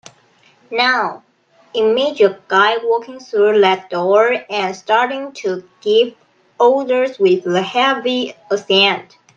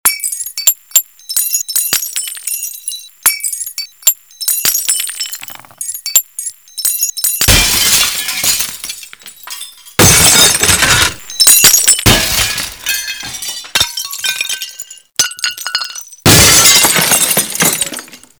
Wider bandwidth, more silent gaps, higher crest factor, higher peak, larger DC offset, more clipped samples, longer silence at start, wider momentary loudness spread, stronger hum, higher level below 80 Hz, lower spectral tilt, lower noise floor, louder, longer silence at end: second, 7.4 kHz vs over 20 kHz; neither; about the same, 16 dB vs 14 dB; about the same, 0 dBFS vs 0 dBFS; second, under 0.1% vs 0.2%; second, under 0.1% vs 0.3%; first, 0.7 s vs 0.05 s; second, 10 LU vs 18 LU; neither; second, -70 dBFS vs -32 dBFS; first, -4 dB/octave vs -1 dB/octave; first, -53 dBFS vs -33 dBFS; second, -16 LUFS vs -10 LUFS; about the same, 0.35 s vs 0.25 s